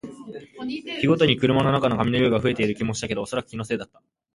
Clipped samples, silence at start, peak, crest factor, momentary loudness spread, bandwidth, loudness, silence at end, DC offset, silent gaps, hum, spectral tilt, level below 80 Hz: under 0.1%; 0.05 s; -4 dBFS; 18 dB; 17 LU; 11.5 kHz; -23 LUFS; 0.5 s; under 0.1%; none; none; -6 dB/octave; -50 dBFS